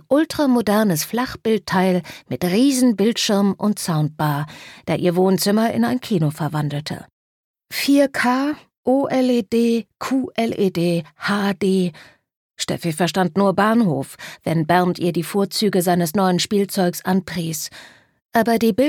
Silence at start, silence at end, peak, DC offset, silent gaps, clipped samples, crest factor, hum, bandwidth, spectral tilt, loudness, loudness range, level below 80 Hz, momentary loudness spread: 0.1 s; 0 s; -2 dBFS; under 0.1%; 7.12-7.54 s, 8.77-8.84 s, 12.36-12.49 s; under 0.1%; 16 dB; none; 19 kHz; -5.5 dB/octave; -19 LUFS; 2 LU; -58 dBFS; 9 LU